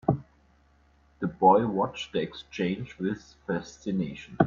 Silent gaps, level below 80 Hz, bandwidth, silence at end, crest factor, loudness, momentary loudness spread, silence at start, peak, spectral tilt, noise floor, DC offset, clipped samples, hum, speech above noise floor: none; -58 dBFS; 7.4 kHz; 0 s; 24 dB; -29 LUFS; 14 LU; 0.1 s; -4 dBFS; -7 dB/octave; -62 dBFS; under 0.1%; under 0.1%; none; 35 dB